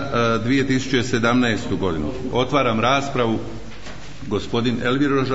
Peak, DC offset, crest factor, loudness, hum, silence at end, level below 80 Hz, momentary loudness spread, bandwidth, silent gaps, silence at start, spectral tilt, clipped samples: -6 dBFS; 3%; 16 dB; -20 LUFS; none; 0 s; -44 dBFS; 16 LU; 8 kHz; none; 0 s; -5.5 dB/octave; under 0.1%